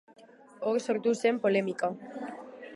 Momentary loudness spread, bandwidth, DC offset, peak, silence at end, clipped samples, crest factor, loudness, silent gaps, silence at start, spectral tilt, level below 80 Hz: 14 LU; 11.5 kHz; under 0.1%; -14 dBFS; 0 s; under 0.1%; 18 dB; -29 LUFS; none; 0.2 s; -5.5 dB/octave; -84 dBFS